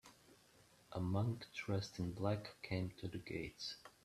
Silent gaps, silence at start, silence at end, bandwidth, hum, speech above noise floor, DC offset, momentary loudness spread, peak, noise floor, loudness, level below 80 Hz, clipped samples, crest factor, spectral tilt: none; 0.05 s; 0.15 s; 13.5 kHz; none; 26 dB; under 0.1%; 8 LU; -24 dBFS; -69 dBFS; -44 LUFS; -70 dBFS; under 0.1%; 20 dB; -6.5 dB/octave